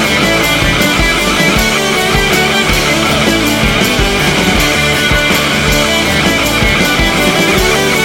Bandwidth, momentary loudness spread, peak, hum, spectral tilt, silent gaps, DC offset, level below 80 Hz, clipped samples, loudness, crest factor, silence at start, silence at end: 17.5 kHz; 1 LU; 0 dBFS; none; -3.5 dB/octave; none; under 0.1%; -22 dBFS; under 0.1%; -9 LUFS; 10 dB; 0 s; 0 s